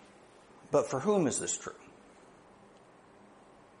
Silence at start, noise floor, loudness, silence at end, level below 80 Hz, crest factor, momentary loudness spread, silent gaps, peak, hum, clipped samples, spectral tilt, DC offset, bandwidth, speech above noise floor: 0.65 s; -58 dBFS; -31 LUFS; 1.95 s; -72 dBFS; 22 dB; 14 LU; none; -14 dBFS; none; under 0.1%; -4.5 dB/octave; under 0.1%; 10.5 kHz; 28 dB